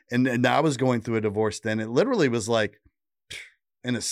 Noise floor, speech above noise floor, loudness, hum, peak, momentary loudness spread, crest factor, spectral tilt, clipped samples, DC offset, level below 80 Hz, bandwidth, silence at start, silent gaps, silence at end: -47 dBFS; 23 dB; -24 LUFS; none; -10 dBFS; 17 LU; 16 dB; -5 dB/octave; under 0.1%; under 0.1%; -64 dBFS; 14.5 kHz; 0.1 s; none; 0 s